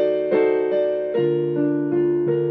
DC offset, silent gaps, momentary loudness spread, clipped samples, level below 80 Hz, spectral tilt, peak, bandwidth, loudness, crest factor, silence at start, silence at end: under 0.1%; none; 3 LU; under 0.1%; -64 dBFS; -11 dB/octave; -8 dBFS; 4.5 kHz; -20 LUFS; 12 dB; 0 s; 0 s